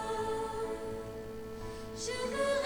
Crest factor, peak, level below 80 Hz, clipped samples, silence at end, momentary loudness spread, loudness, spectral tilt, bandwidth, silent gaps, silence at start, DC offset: 14 dB; -22 dBFS; -54 dBFS; under 0.1%; 0 s; 10 LU; -38 LUFS; -3.5 dB/octave; over 20 kHz; none; 0 s; under 0.1%